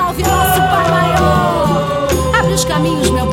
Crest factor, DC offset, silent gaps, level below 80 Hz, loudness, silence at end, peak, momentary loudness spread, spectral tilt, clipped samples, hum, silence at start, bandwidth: 12 dB; under 0.1%; none; -26 dBFS; -13 LUFS; 0 s; 0 dBFS; 3 LU; -5 dB/octave; under 0.1%; none; 0 s; 16.5 kHz